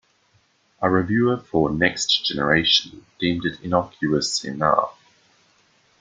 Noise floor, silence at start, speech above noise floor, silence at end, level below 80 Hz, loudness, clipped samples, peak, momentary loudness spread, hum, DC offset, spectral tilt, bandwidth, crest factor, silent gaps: -62 dBFS; 0.8 s; 41 dB; 1.1 s; -52 dBFS; -21 LUFS; under 0.1%; -2 dBFS; 7 LU; none; under 0.1%; -4 dB/octave; 9.6 kHz; 20 dB; none